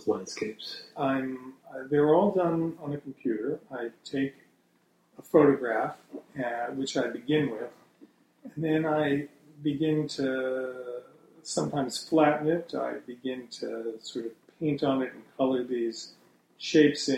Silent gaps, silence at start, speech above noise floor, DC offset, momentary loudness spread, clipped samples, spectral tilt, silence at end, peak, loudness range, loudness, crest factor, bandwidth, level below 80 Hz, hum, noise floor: none; 0 s; 39 dB; under 0.1%; 16 LU; under 0.1%; -5.5 dB/octave; 0 s; -8 dBFS; 3 LU; -29 LUFS; 22 dB; 13.5 kHz; -70 dBFS; none; -68 dBFS